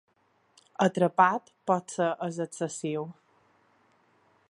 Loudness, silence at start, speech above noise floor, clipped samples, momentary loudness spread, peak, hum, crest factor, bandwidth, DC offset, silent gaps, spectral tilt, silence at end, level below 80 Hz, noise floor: -28 LUFS; 0.8 s; 41 dB; under 0.1%; 12 LU; -6 dBFS; none; 24 dB; 11.5 kHz; under 0.1%; none; -5.5 dB/octave; 1.35 s; -80 dBFS; -69 dBFS